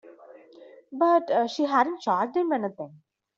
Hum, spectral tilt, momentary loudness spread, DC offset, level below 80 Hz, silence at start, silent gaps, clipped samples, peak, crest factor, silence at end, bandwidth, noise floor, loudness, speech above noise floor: none; -5.5 dB/octave; 17 LU; under 0.1%; -78 dBFS; 0.05 s; none; under 0.1%; -10 dBFS; 18 dB; 0.5 s; 7.6 kHz; -51 dBFS; -25 LUFS; 26 dB